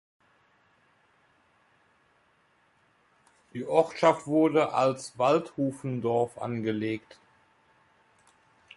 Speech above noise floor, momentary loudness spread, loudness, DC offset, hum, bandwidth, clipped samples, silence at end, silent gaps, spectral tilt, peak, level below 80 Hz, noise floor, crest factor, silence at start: 40 dB; 9 LU; -27 LUFS; under 0.1%; none; 11.5 kHz; under 0.1%; 1.75 s; none; -6.5 dB/octave; -8 dBFS; -72 dBFS; -67 dBFS; 22 dB; 3.55 s